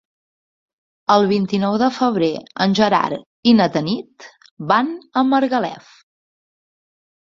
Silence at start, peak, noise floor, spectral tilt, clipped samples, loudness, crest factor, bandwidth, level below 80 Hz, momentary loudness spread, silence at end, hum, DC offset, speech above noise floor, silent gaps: 1.1 s; -2 dBFS; under -90 dBFS; -6 dB/octave; under 0.1%; -18 LUFS; 18 dB; 7.4 kHz; -60 dBFS; 9 LU; 1.6 s; none; under 0.1%; over 73 dB; 3.26-3.43 s, 4.51-4.57 s